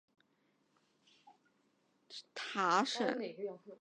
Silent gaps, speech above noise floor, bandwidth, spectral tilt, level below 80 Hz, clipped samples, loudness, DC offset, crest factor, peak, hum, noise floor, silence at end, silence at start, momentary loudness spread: none; 40 dB; 10 kHz; -3.5 dB/octave; under -90 dBFS; under 0.1%; -36 LUFS; under 0.1%; 24 dB; -18 dBFS; none; -77 dBFS; 0.05 s; 1.25 s; 18 LU